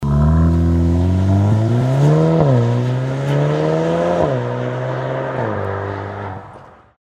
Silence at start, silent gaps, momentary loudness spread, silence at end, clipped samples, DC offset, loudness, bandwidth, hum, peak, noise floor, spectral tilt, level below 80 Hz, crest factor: 0 s; none; 10 LU; 0.3 s; under 0.1%; under 0.1%; -17 LUFS; 9.2 kHz; none; -2 dBFS; -40 dBFS; -8.5 dB/octave; -28 dBFS; 14 dB